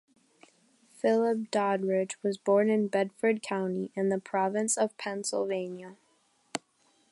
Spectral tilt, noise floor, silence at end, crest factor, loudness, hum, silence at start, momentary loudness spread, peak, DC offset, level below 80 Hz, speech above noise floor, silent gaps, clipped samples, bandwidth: -4.5 dB/octave; -69 dBFS; 0.55 s; 18 dB; -29 LUFS; none; 1.05 s; 14 LU; -12 dBFS; under 0.1%; -82 dBFS; 40 dB; none; under 0.1%; 11.5 kHz